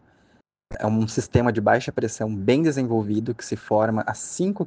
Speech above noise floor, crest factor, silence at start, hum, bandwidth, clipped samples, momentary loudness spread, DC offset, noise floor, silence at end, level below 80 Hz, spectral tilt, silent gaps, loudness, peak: 39 dB; 20 dB; 0.7 s; none; 10 kHz; under 0.1%; 9 LU; under 0.1%; -61 dBFS; 0 s; -50 dBFS; -6 dB/octave; none; -23 LUFS; -4 dBFS